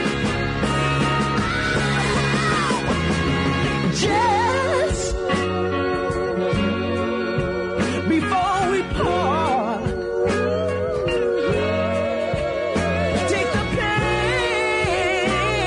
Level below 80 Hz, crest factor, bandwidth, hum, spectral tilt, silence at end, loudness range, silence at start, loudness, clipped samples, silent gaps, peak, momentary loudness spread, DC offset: -36 dBFS; 12 dB; 11 kHz; none; -5 dB/octave; 0 s; 2 LU; 0 s; -21 LUFS; under 0.1%; none; -8 dBFS; 4 LU; under 0.1%